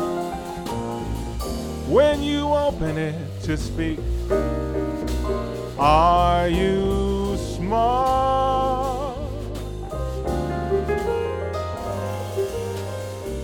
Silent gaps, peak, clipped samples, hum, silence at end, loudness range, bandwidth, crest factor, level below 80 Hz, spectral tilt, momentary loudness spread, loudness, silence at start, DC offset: none; -4 dBFS; under 0.1%; none; 0 s; 6 LU; 19 kHz; 18 dB; -32 dBFS; -6.5 dB/octave; 11 LU; -23 LUFS; 0 s; under 0.1%